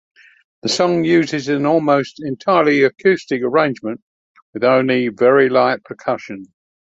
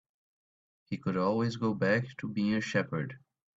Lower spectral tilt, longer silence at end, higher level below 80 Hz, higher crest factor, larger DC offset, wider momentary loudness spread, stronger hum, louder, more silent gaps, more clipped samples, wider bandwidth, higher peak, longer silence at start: second, -5.5 dB/octave vs -7 dB/octave; about the same, 0.5 s vs 0.4 s; first, -62 dBFS vs -68 dBFS; about the same, 16 dB vs 18 dB; neither; first, 13 LU vs 8 LU; neither; first, -16 LUFS vs -32 LUFS; first, 4.02-4.35 s, 4.42-4.53 s vs none; neither; about the same, 8 kHz vs 7.8 kHz; first, 0 dBFS vs -14 dBFS; second, 0.65 s vs 0.9 s